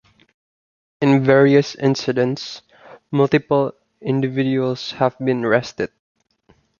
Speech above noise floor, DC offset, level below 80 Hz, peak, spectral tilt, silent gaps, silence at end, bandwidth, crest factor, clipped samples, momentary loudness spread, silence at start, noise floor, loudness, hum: 41 dB; under 0.1%; -60 dBFS; -2 dBFS; -7 dB/octave; none; 0.95 s; 7.2 kHz; 18 dB; under 0.1%; 15 LU; 1 s; -58 dBFS; -18 LUFS; none